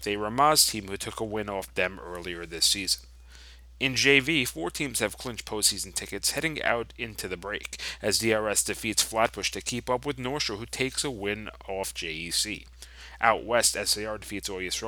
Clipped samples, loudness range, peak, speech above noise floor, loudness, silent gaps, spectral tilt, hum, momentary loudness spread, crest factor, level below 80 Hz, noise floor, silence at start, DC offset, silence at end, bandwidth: under 0.1%; 4 LU; -4 dBFS; 20 dB; -27 LUFS; none; -2 dB/octave; none; 13 LU; 24 dB; -50 dBFS; -49 dBFS; 0 s; under 0.1%; 0 s; over 20 kHz